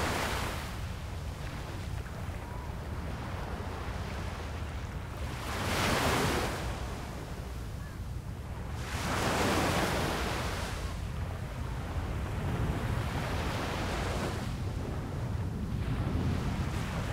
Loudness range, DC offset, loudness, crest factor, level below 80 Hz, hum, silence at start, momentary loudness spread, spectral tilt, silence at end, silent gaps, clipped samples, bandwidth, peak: 6 LU; under 0.1%; -35 LUFS; 18 dB; -42 dBFS; none; 0 s; 11 LU; -5 dB/octave; 0 s; none; under 0.1%; 16 kHz; -14 dBFS